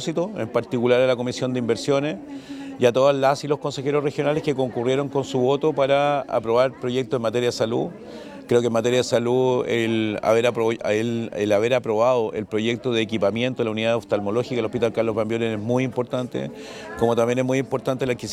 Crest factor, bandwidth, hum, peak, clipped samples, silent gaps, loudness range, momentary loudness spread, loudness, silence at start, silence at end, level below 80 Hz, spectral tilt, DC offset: 18 dB; 14 kHz; none; -4 dBFS; under 0.1%; none; 2 LU; 7 LU; -22 LUFS; 0 s; 0 s; -60 dBFS; -5.5 dB/octave; under 0.1%